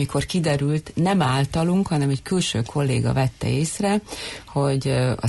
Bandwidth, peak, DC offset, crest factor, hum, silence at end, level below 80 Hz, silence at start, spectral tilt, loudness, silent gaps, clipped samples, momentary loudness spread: 12 kHz; -10 dBFS; under 0.1%; 12 dB; none; 0 s; -44 dBFS; 0 s; -6 dB/octave; -22 LUFS; none; under 0.1%; 4 LU